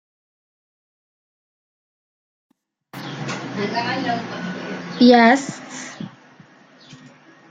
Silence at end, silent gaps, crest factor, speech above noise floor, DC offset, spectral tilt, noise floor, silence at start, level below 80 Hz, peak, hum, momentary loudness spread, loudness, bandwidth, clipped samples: 0.55 s; none; 22 dB; 32 dB; under 0.1%; -5 dB/octave; -49 dBFS; 2.95 s; -68 dBFS; -2 dBFS; none; 22 LU; -19 LUFS; 9.2 kHz; under 0.1%